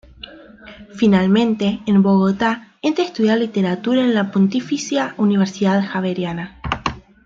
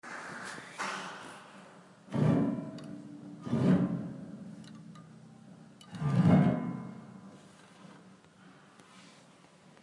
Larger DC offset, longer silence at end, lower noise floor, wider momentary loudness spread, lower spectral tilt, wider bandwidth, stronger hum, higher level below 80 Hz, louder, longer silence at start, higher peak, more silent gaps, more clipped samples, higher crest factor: neither; second, 0.25 s vs 0.75 s; second, -39 dBFS vs -59 dBFS; second, 11 LU vs 27 LU; about the same, -6.5 dB/octave vs -7.5 dB/octave; second, 7.6 kHz vs 11.5 kHz; neither; first, -46 dBFS vs -72 dBFS; first, -18 LUFS vs -31 LUFS; first, 0.25 s vs 0.05 s; first, -2 dBFS vs -14 dBFS; neither; neither; about the same, 16 dB vs 20 dB